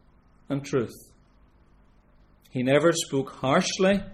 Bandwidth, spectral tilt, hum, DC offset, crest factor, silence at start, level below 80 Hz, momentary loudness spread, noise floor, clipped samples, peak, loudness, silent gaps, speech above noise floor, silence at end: 14.5 kHz; -4.5 dB/octave; 50 Hz at -60 dBFS; under 0.1%; 20 dB; 0.5 s; -54 dBFS; 12 LU; -58 dBFS; under 0.1%; -8 dBFS; -25 LUFS; none; 33 dB; 0 s